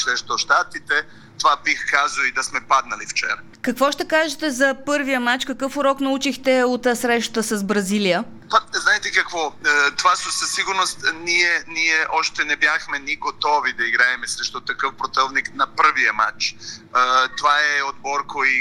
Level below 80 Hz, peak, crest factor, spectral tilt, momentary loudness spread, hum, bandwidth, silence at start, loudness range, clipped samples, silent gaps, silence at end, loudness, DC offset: -56 dBFS; -2 dBFS; 18 dB; -2 dB/octave; 7 LU; none; 19 kHz; 0 s; 2 LU; under 0.1%; none; 0 s; -19 LUFS; under 0.1%